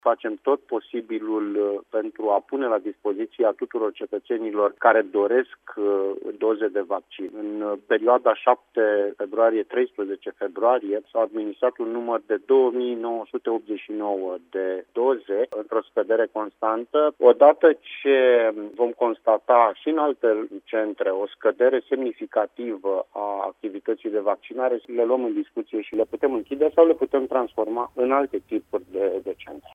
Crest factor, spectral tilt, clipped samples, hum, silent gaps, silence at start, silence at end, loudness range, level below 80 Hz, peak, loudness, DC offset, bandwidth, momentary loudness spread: 20 dB; -6.5 dB/octave; under 0.1%; none; none; 0.05 s; 0.15 s; 6 LU; -72 dBFS; -2 dBFS; -23 LUFS; under 0.1%; 3.7 kHz; 11 LU